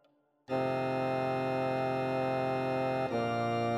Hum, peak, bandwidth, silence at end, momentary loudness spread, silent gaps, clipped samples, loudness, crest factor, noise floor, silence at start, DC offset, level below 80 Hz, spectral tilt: none; -20 dBFS; 15.5 kHz; 0 s; 1 LU; none; under 0.1%; -32 LUFS; 12 dB; -60 dBFS; 0.5 s; under 0.1%; -72 dBFS; -7.5 dB/octave